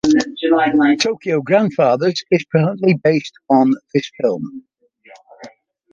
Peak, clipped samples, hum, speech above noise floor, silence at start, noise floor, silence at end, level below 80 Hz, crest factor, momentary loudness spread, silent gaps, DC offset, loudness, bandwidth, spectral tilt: -2 dBFS; under 0.1%; none; 31 dB; 0.05 s; -47 dBFS; 0.45 s; -58 dBFS; 14 dB; 6 LU; none; under 0.1%; -16 LUFS; 7.6 kHz; -6 dB/octave